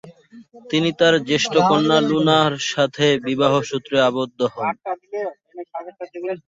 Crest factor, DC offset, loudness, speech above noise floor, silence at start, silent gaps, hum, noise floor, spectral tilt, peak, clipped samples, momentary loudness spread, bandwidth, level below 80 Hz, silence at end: 18 dB; under 0.1%; -19 LUFS; 26 dB; 0.05 s; none; none; -44 dBFS; -4.5 dB/octave; -2 dBFS; under 0.1%; 15 LU; 8 kHz; -62 dBFS; 0.1 s